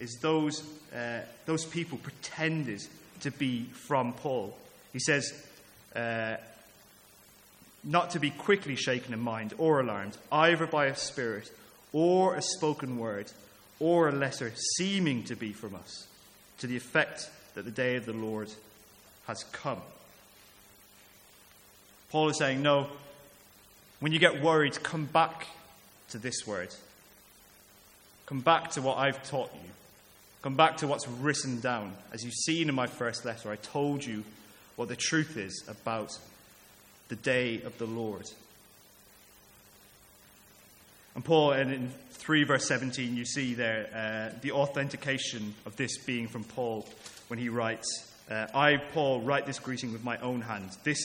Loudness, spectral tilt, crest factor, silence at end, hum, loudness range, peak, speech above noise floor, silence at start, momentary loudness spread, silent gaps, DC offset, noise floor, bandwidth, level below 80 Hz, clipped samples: -31 LUFS; -4 dB/octave; 26 dB; 0 s; none; 8 LU; -6 dBFS; 27 dB; 0 s; 17 LU; none; under 0.1%; -58 dBFS; 17 kHz; -70 dBFS; under 0.1%